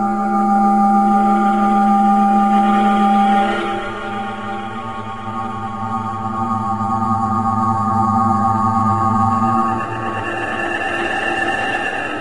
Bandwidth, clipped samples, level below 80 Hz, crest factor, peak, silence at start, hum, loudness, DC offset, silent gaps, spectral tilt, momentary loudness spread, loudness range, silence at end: 11 kHz; under 0.1%; -44 dBFS; 14 dB; -2 dBFS; 0 s; none; -17 LUFS; 1%; none; -6.5 dB/octave; 11 LU; 8 LU; 0 s